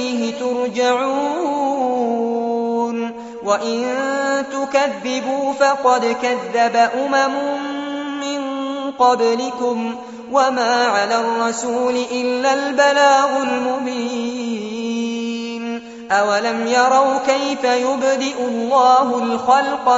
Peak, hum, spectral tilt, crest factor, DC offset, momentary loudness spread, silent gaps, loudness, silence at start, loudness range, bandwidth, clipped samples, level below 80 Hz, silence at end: -2 dBFS; none; -1.5 dB/octave; 16 dB; under 0.1%; 10 LU; none; -18 LUFS; 0 s; 4 LU; 8 kHz; under 0.1%; -64 dBFS; 0 s